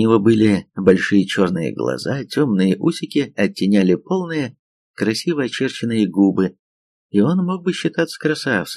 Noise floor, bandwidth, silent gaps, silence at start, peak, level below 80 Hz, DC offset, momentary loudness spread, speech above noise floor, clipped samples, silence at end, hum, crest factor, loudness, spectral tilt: under -90 dBFS; 13 kHz; 4.59-4.94 s, 6.59-7.10 s; 0 s; 0 dBFS; -58 dBFS; under 0.1%; 7 LU; over 73 dB; under 0.1%; 0 s; none; 18 dB; -18 LUFS; -6.5 dB/octave